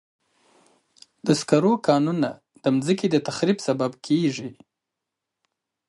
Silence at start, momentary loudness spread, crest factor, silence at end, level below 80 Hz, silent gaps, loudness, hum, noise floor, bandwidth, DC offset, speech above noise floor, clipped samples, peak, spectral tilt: 1.25 s; 8 LU; 22 dB; 1.35 s; -68 dBFS; none; -23 LUFS; none; -84 dBFS; 11.5 kHz; under 0.1%; 62 dB; under 0.1%; -4 dBFS; -6 dB/octave